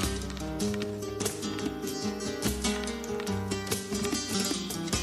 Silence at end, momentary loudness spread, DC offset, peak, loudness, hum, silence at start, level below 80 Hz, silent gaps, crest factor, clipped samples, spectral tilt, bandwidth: 0 s; 5 LU; under 0.1%; -14 dBFS; -32 LUFS; none; 0 s; -44 dBFS; none; 18 dB; under 0.1%; -3.5 dB/octave; 16 kHz